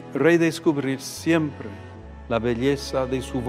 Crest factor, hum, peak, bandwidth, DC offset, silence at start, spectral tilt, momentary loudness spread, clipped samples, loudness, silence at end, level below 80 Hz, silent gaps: 18 dB; none; -6 dBFS; 15.5 kHz; under 0.1%; 0 s; -5.5 dB/octave; 18 LU; under 0.1%; -23 LUFS; 0 s; -44 dBFS; none